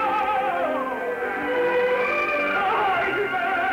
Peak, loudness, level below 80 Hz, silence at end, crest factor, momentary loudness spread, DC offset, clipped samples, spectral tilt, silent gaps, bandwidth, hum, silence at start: -12 dBFS; -23 LUFS; -58 dBFS; 0 s; 10 dB; 5 LU; under 0.1%; under 0.1%; -5 dB/octave; none; 16 kHz; none; 0 s